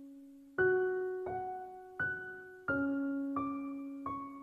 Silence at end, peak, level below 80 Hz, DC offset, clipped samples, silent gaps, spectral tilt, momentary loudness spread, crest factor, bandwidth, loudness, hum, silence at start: 0 s; -20 dBFS; -68 dBFS; under 0.1%; under 0.1%; none; -8.5 dB/octave; 14 LU; 18 dB; 3.8 kHz; -37 LUFS; none; 0 s